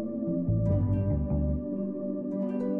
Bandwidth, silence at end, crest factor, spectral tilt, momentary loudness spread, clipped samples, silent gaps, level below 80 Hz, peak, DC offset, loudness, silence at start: 2.9 kHz; 0 s; 12 dB; -13 dB/octave; 6 LU; under 0.1%; none; -38 dBFS; -18 dBFS; under 0.1%; -30 LUFS; 0 s